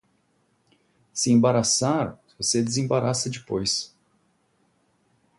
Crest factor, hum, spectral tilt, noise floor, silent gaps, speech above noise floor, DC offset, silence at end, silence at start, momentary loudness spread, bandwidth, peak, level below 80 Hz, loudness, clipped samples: 18 dB; none; -4 dB/octave; -68 dBFS; none; 45 dB; under 0.1%; 1.5 s; 1.15 s; 9 LU; 11.5 kHz; -8 dBFS; -60 dBFS; -23 LUFS; under 0.1%